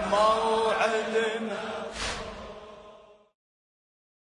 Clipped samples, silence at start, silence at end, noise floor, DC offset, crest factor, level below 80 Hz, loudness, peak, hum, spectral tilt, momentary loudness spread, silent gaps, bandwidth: under 0.1%; 0 s; 1.2 s; -52 dBFS; under 0.1%; 18 dB; -54 dBFS; -27 LUFS; -12 dBFS; none; -3 dB/octave; 20 LU; none; 11 kHz